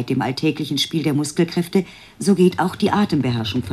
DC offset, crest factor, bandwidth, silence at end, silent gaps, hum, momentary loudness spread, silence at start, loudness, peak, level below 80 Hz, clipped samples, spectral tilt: under 0.1%; 16 dB; 14 kHz; 0 s; none; none; 6 LU; 0 s; -20 LUFS; -4 dBFS; -54 dBFS; under 0.1%; -5.5 dB/octave